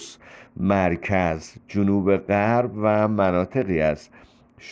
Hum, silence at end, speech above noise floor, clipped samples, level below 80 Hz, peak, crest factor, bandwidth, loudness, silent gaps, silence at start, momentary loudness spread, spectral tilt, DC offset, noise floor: none; 0 s; 23 dB; under 0.1%; -48 dBFS; -8 dBFS; 16 dB; 8 kHz; -22 LUFS; none; 0 s; 10 LU; -7.5 dB/octave; under 0.1%; -45 dBFS